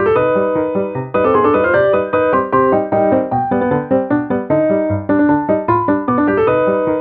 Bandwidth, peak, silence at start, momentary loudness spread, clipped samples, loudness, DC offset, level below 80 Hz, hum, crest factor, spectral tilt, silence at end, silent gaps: 4.3 kHz; 0 dBFS; 0 s; 4 LU; under 0.1%; -14 LUFS; under 0.1%; -46 dBFS; none; 12 dB; -11 dB/octave; 0 s; none